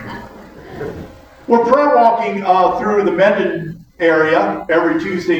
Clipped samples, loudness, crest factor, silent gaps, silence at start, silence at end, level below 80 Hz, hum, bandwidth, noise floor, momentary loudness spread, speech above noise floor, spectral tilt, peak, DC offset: under 0.1%; -14 LUFS; 14 dB; none; 0 s; 0 s; -48 dBFS; none; 8.6 kHz; -36 dBFS; 19 LU; 22 dB; -6.5 dB/octave; 0 dBFS; under 0.1%